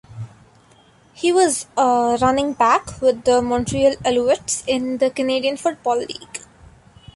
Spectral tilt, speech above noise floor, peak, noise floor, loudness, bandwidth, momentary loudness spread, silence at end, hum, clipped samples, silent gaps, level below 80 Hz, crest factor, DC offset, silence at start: -4 dB/octave; 34 dB; -4 dBFS; -52 dBFS; -19 LUFS; 11.5 kHz; 14 LU; 0.8 s; none; under 0.1%; none; -48 dBFS; 16 dB; under 0.1%; 0.1 s